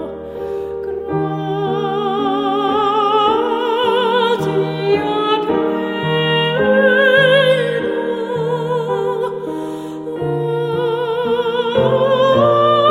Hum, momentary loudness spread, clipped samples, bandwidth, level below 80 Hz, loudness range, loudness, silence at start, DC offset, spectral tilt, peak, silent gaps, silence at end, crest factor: none; 12 LU; under 0.1%; 15 kHz; -52 dBFS; 5 LU; -16 LUFS; 0 s; under 0.1%; -6.5 dB/octave; -2 dBFS; none; 0 s; 14 dB